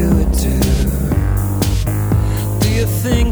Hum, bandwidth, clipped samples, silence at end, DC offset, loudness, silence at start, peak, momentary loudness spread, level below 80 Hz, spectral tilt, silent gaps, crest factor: none; over 20 kHz; under 0.1%; 0 s; under 0.1%; -16 LUFS; 0 s; -2 dBFS; 2 LU; -18 dBFS; -6 dB/octave; none; 12 dB